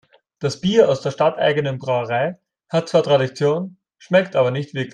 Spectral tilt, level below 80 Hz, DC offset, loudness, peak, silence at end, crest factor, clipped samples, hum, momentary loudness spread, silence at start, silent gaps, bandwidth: -6 dB/octave; -62 dBFS; under 0.1%; -19 LUFS; -2 dBFS; 0.05 s; 18 dB; under 0.1%; none; 9 LU; 0.4 s; none; 9.8 kHz